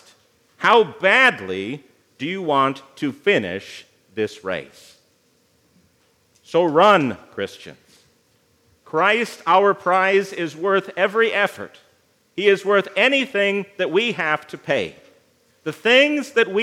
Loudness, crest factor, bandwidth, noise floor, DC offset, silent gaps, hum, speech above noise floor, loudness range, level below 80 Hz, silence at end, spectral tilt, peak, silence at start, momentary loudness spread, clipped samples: -19 LUFS; 20 dB; 14.5 kHz; -61 dBFS; under 0.1%; none; none; 42 dB; 5 LU; -74 dBFS; 0 s; -4.5 dB/octave; 0 dBFS; 0.6 s; 16 LU; under 0.1%